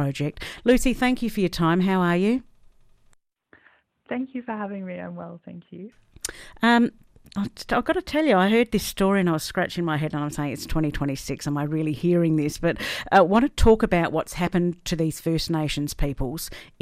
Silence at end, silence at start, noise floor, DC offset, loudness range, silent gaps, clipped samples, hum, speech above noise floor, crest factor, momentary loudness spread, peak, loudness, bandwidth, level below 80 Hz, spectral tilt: 0.15 s; 0 s; -60 dBFS; under 0.1%; 10 LU; none; under 0.1%; none; 37 dB; 18 dB; 15 LU; -6 dBFS; -23 LUFS; 15.5 kHz; -38 dBFS; -5.5 dB/octave